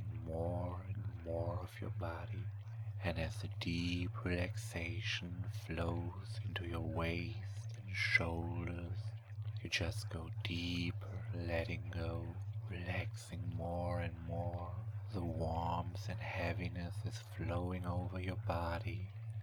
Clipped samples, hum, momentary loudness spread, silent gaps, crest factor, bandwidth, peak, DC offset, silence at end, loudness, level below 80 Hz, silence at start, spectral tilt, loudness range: under 0.1%; none; 7 LU; none; 24 dB; 18 kHz; -18 dBFS; under 0.1%; 0 s; -41 LUFS; -56 dBFS; 0 s; -6 dB/octave; 3 LU